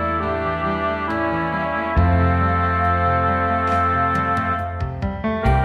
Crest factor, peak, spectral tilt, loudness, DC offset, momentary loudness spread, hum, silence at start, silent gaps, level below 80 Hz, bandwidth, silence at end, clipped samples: 14 dB; -6 dBFS; -8.5 dB/octave; -20 LUFS; under 0.1%; 6 LU; none; 0 s; none; -30 dBFS; 6.2 kHz; 0 s; under 0.1%